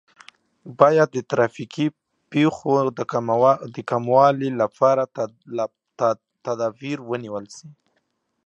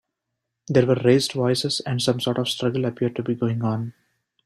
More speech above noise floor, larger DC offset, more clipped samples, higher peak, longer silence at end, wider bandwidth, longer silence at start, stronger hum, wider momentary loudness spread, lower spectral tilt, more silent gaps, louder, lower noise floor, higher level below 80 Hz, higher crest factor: second, 51 dB vs 59 dB; neither; neither; first, 0 dBFS vs -4 dBFS; first, 0.75 s vs 0.55 s; second, 8.4 kHz vs 13 kHz; about the same, 0.65 s vs 0.7 s; neither; first, 14 LU vs 7 LU; about the same, -6.5 dB/octave vs -5.5 dB/octave; neither; about the same, -21 LUFS vs -22 LUFS; second, -72 dBFS vs -81 dBFS; second, -68 dBFS vs -60 dBFS; about the same, 22 dB vs 20 dB